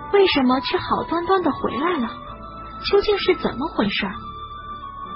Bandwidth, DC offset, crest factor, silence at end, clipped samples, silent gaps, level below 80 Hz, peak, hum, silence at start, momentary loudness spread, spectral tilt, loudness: 5.8 kHz; under 0.1%; 16 dB; 0 s; under 0.1%; none; -44 dBFS; -4 dBFS; none; 0 s; 17 LU; -9.5 dB/octave; -21 LUFS